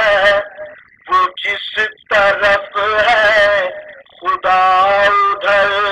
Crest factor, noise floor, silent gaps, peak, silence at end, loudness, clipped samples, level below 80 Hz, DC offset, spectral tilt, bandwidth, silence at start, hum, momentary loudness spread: 12 dB; -34 dBFS; none; -2 dBFS; 0 s; -13 LUFS; under 0.1%; -48 dBFS; under 0.1%; -2.5 dB/octave; 10.5 kHz; 0 s; none; 9 LU